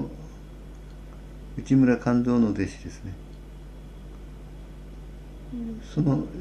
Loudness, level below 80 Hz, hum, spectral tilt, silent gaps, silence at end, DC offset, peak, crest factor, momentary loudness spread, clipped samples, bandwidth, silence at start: -24 LUFS; -42 dBFS; none; -8 dB/octave; none; 0 s; under 0.1%; -8 dBFS; 18 dB; 23 LU; under 0.1%; 8.8 kHz; 0 s